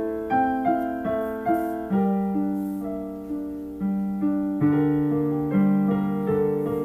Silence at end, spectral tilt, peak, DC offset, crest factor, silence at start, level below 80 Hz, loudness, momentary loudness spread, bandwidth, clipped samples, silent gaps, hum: 0 s; -10 dB/octave; -10 dBFS; under 0.1%; 14 dB; 0 s; -52 dBFS; -24 LUFS; 10 LU; 15 kHz; under 0.1%; none; none